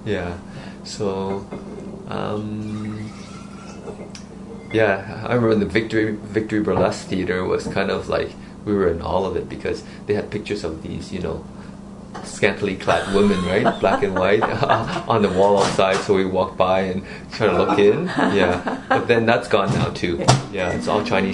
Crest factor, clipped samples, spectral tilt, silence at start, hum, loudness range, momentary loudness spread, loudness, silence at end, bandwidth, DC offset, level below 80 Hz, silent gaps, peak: 20 dB; under 0.1%; -5.5 dB/octave; 0 s; none; 10 LU; 17 LU; -20 LUFS; 0 s; 11 kHz; under 0.1%; -46 dBFS; none; 0 dBFS